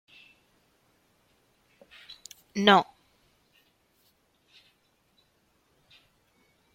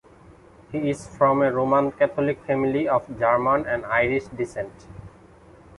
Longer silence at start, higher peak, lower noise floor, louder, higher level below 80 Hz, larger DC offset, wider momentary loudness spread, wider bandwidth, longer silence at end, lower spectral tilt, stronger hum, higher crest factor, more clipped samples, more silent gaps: first, 2.55 s vs 0.3 s; about the same, -4 dBFS vs -6 dBFS; first, -69 dBFS vs -50 dBFS; about the same, -23 LUFS vs -23 LUFS; second, -74 dBFS vs -52 dBFS; neither; first, 28 LU vs 13 LU; first, 16 kHz vs 11.5 kHz; first, 3.9 s vs 0.7 s; second, -4.5 dB/octave vs -7 dB/octave; neither; first, 30 dB vs 18 dB; neither; neither